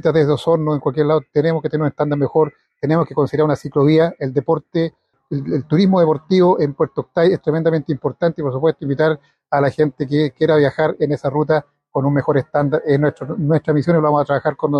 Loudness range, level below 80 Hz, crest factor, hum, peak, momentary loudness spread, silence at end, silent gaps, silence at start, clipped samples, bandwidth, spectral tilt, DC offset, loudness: 2 LU; -54 dBFS; 14 dB; none; -4 dBFS; 7 LU; 0 s; none; 0.05 s; under 0.1%; 8.6 kHz; -9 dB/octave; under 0.1%; -17 LUFS